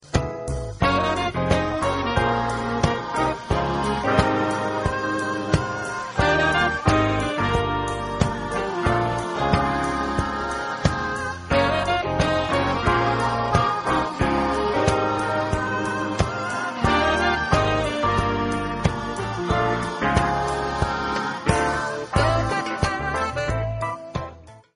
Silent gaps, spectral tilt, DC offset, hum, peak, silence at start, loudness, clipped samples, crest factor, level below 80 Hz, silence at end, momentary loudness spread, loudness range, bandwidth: none; -5.5 dB/octave; under 0.1%; none; -4 dBFS; 0.05 s; -23 LUFS; under 0.1%; 20 dB; -36 dBFS; 0.15 s; 6 LU; 2 LU; 10.5 kHz